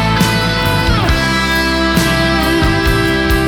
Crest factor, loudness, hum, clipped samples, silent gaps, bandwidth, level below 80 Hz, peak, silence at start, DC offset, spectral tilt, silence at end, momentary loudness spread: 10 dB; -13 LUFS; none; under 0.1%; none; 19.5 kHz; -20 dBFS; -2 dBFS; 0 s; under 0.1%; -5 dB/octave; 0 s; 1 LU